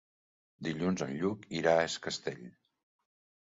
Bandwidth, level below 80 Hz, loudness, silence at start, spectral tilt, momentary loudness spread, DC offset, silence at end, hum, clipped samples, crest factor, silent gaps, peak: 7.8 kHz; -66 dBFS; -33 LUFS; 0.6 s; -5 dB/octave; 13 LU; under 0.1%; 0.95 s; none; under 0.1%; 22 dB; none; -12 dBFS